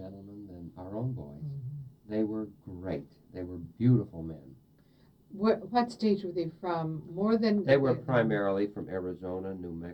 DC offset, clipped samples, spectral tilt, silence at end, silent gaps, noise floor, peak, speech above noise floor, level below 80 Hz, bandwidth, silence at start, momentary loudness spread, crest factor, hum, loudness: under 0.1%; under 0.1%; -8.5 dB/octave; 0 s; none; -62 dBFS; -12 dBFS; 31 dB; -62 dBFS; 8.6 kHz; 0 s; 18 LU; 20 dB; none; -31 LUFS